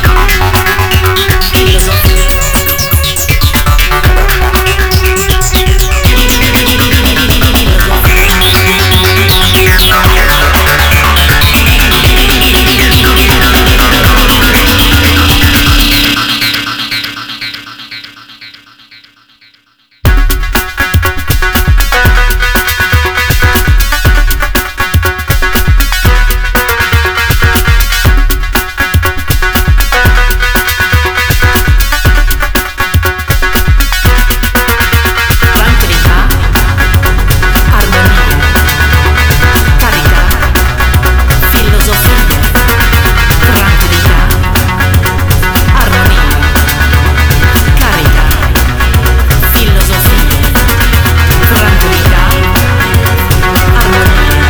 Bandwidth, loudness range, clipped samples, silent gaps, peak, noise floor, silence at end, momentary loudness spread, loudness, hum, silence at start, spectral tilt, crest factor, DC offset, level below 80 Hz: over 20 kHz; 4 LU; 0.3%; none; 0 dBFS; -47 dBFS; 0 s; 5 LU; -7 LUFS; none; 0 s; -4 dB/octave; 6 dB; under 0.1%; -10 dBFS